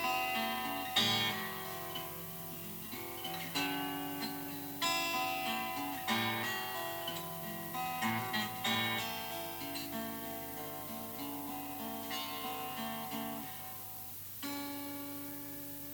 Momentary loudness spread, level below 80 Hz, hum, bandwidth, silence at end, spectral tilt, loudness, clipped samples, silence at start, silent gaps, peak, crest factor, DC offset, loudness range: 9 LU; -68 dBFS; 50 Hz at -60 dBFS; over 20 kHz; 0 s; -2.5 dB/octave; -37 LUFS; under 0.1%; 0 s; none; -18 dBFS; 22 dB; under 0.1%; 5 LU